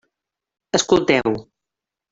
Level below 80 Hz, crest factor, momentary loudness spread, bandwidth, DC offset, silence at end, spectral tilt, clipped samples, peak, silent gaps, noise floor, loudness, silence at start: -54 dBFS; 20 dB; 9 LU; 7.8 kHz; under 0.1%; 0.7 s; -3.5 dB/octave; under 0.1%; -2 dBFS; none; -86 dBFS; -18 LUFS; 0.75 s